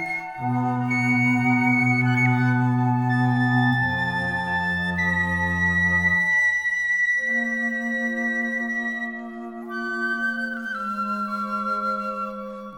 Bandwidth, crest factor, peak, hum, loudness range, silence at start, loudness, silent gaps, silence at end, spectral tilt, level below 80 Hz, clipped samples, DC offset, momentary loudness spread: 12 kHz; 14 dB; -8 dBFS; none; 6 LU; 0 s; -22 LUFS; none; 0 s; -6.5 dB/octave; -52 dBFS; under 0.1%; under 0.1%; 9 LU